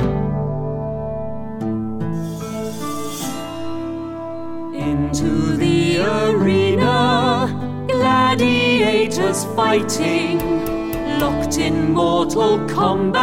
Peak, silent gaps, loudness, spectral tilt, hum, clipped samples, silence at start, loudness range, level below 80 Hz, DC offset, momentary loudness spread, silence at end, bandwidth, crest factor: -6 dBFS; none; -19 LUFS; -5.5 dB/octave; none; under 0.1%; 0 s; 9 LU; -38 dBFS; 1%; 11 LU; 0 s; 17 kHz; 12 dB